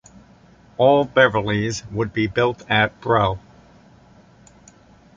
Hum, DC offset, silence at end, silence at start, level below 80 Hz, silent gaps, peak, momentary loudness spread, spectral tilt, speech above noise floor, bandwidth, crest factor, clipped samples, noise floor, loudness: none; under 0.1%; 1.8 s; 0.8 s; -48 dBFS; none; -2 dBFS; 10 LU; -5.5 dB/octave; 31 dB; 7.6 kHz; 20 dB; under 0.1%; -50 dBFS; -19 LUFS